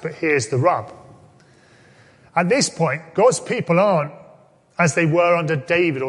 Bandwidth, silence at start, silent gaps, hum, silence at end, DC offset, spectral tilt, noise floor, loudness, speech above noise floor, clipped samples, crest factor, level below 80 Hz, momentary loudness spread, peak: 11.5 kHz; 0 s; none; none; 0 s; under 0.1%; -5 dB/octave; -51 dBFS; -19 LUFS; 33 dB; under 0.1%; 18 dB; -62 dBFS; 8 LU; -2 dBFS